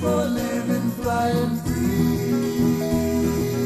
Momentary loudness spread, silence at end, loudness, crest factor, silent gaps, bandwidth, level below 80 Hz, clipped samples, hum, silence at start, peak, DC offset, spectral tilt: 3 LU; 0 s; -22 LUFS; 12 dB; none; 13.5 kHz; -40 dBFS; under 0.1%; none; 0 s; -10 dBFS; under 0.1%; -6.5 dB/octave